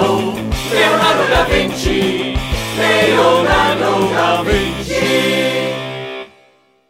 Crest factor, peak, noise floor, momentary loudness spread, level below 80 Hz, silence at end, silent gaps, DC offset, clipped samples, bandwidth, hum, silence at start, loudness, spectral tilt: 14 dB; -2 dBFS; -52 dBFS; 9 LU; -28 dBFS; 0.65 s; none; under 0.1%; under 0.1%; 16 kHz; none; 0 s; -14 LUFS; -4.5 dB/octave